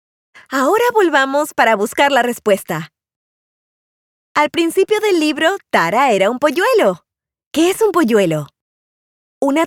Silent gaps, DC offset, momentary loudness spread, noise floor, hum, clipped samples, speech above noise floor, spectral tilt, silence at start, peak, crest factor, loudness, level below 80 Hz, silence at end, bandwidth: 3.16-4.35 s, 7.47-7.51 s, 8.61-9.41 s; under 0.1%; 9 LU; under -90 dBFS; none; under 0.1%; over 76 dB; -4 dB/octave; 0.5 s; 0 dBFS; 16 dB; -15 LUFS; -64 dBFS; 0 s; 19 kHz